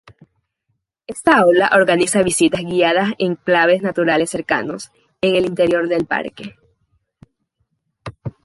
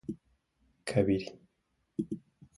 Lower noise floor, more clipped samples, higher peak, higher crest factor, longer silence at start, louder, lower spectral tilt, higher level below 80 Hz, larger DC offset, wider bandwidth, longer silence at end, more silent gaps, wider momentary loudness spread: second, -72 dBFS vs -78 dBFS; neither; first, 0 dBFS vs -12 dBFS; second, 18 dB vs 24 dB; first, 1.1 s vs 0.1 s; first, -16 LUFS vs -34 LUFS; second, -4 dB/octave vs -7 dB/octave; first, -54 dBFS vs -60 dBFS; neither; about the same, 11.5 kHz vs 11.5 kHz; second, 0.15 s vs 0.4 s; neither; first, 19 LU vs 16 LU